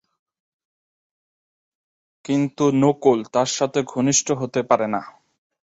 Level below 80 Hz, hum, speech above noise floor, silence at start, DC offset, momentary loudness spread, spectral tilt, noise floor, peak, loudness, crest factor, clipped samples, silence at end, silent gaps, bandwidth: -64 dBFS; none; over 70 dB; 2.3 s; under 0.1%; 7 LU; -4.5 dB/octave; under -90 dBFS; -2 dBFS; -20 LUFS; 20 dB; under 0.1%; 0.65 s; none; 8 kHz